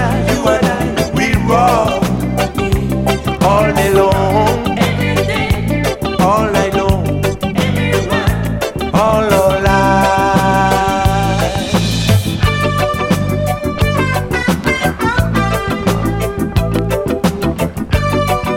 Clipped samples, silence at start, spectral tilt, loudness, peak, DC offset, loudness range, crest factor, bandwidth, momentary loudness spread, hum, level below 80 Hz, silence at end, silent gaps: under 0.1%; 0 s; -6 dB/octave; -14 LUFS; 0 dBFS; under 0.1%; 3 LU; 14 dB; 17 kHz; 5 LU; none; -26 dBFS; 0 s; none